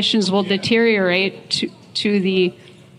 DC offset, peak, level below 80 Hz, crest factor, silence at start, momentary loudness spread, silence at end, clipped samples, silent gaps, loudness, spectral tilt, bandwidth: under 0.1%; -2 dBFS; -60 dBFS; 16 dB; 0 s; 7 LU; 0.3 s; under 0.1%; none; -18 LUFS; -4.5 dB/octave; 11 kHz